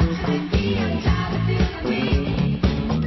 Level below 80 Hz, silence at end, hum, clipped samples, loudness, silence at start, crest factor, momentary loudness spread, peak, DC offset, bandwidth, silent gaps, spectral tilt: -28 dBFS; 0 s; none; under 0.1%; -22 LUFS; 0 s; 14 dB; 1 LU; -6 dBFS; under 0.1%; 6 kHz; none; -7.5 dB/octave